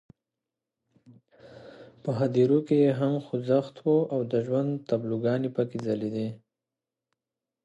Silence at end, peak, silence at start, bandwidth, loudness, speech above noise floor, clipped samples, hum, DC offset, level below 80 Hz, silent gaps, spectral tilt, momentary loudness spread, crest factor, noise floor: 1.3 s; -10 dBFS; 1.45 s; 8.4 kHz; -27 LUFS; 63 dB; under 0.1%; none; under 0.1%; -72 dBFS; none; -9 dB/octave; 9 LU; 18 dB; -89 dBFS